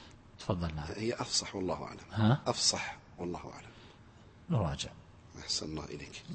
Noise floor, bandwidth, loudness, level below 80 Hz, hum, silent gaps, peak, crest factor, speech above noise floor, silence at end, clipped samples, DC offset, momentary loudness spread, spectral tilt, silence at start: -57 dBFS; 8.8 kHz; -34 LUFS; -54 dBFS; none; none; -16 dBFS; 22 dB; 22 dB; 0 s; under 0.1%; under 0.1%; 19 LU; -4 dB/octave; 0 s